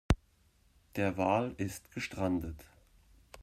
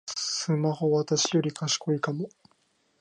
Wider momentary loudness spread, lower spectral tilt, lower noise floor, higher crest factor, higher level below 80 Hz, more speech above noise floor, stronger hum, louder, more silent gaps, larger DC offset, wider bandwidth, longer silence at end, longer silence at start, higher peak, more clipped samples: first, 12 LU vs 7 LU; first, -6.5 dB/octave vs -4.5 dB/octave; about the same, -68 dBFS vs -69 dBFS; first, 24 dB vs 16 dB; first, -46 dBFS vs -74 dBFS; second, 34 dB vs 42 dB; neither; second, -35 LUFS vs -27 LUFS; neither; neither; first, 16 kHz vs 10.5 kHz; second, 0 s vs 0.75 s; about the same, 0.1 s vs 0.05 s; about the same, -12 dBFS vs -14 dBFS; neither